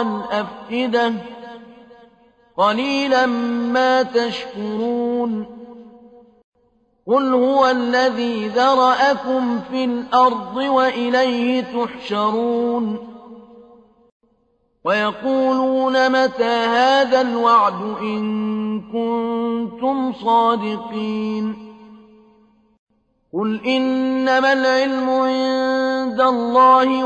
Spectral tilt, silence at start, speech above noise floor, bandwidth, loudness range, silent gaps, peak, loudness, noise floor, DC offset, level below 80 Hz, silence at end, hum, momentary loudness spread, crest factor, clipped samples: -5 dB/octave; 0 s; 46 dB; 8.4 kHz; 7 LU; 6.44-6.52 s, 14.12-14.20 s, 22.79-22.87 s; -4 dBFS; -18 LUFS; -64 dBFS; under 0.1%; -60 dBFS; 0 s; none; 10 LU; 16 dB; under 0.1%